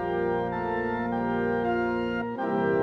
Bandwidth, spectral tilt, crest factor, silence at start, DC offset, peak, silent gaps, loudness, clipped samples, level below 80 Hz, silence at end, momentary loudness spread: 6 kHz; -8.5 dB/octave; 14 dB; 0 s; under 0.1%; -14 dBFS; none; -28 LUFS; under 0.1%; -52 dBFS; 0 s; 2 LU